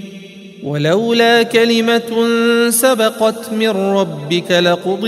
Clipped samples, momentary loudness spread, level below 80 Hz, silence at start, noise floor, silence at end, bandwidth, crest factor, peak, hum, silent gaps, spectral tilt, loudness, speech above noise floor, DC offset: under 0.1%; 8 LU; -64 dBFS; 0 s; -34 dBFS; 0 s; 16 kHz; 14 dB; 0 dBFS; none; none; -4 dB/octave; -14 LUFS; 21 dB; under 0.1%